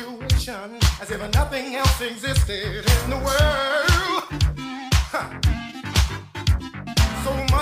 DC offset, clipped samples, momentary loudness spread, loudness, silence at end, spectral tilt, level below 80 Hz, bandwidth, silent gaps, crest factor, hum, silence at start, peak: under 0.1%; under 0.1%; 7 LU; -22 LUFS; 0 s; -4.5 dB/octave; -26 dBFS; 16 kHz; none; 18 dB; none; 0 s; -4 dBFS